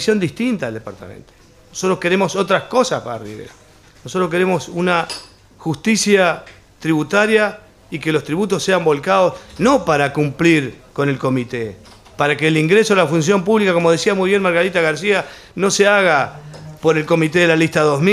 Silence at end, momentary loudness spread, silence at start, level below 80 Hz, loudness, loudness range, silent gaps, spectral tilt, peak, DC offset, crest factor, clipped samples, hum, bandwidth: 0 s; 14 LU; 0 s; -52 dBFS; -16 LUFS; 5 LU; none; -5 dB/octave; 0 dBFS; under 0.1%; 16 dB; under 0.1%; none; 14.5 kHz